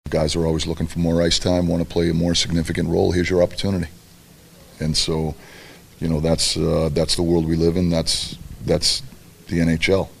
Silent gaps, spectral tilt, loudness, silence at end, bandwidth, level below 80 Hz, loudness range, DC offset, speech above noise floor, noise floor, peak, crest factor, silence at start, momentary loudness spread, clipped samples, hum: none; -5 dB/octave; -20 LUFS; 0.05 s; 15 kHz; -36 dBFS; 4 LU; under 0.1%; 27 dB; -47 dBFS; -4 dBFS; 18 dB; 0.05 s; 7 LU; under 0.1%; none